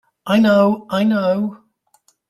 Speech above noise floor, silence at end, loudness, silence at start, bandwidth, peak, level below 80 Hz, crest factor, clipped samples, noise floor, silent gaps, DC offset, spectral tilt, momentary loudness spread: 44 dB; 0.75 s; -17 LUFS; 0.25 s; 13.5 kHz; -4 dBFS; -60 dBFS; 14 dB; under 0.1%; -59 dBFS; none; under 0.1%; -7 dB/octave; 8 LU